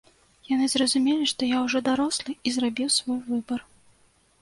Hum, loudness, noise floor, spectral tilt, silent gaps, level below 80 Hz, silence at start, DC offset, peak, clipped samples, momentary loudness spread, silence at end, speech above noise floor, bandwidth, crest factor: none; -25 LUFS; -62 dBFS; -2 dB/octave; none; -64 dBFS; 0.5 s; under 0.1%; -8 dBFS; under 0.1%; 7 LU; 0.8 s; 37 dB; 11.5 kHz; 18 dB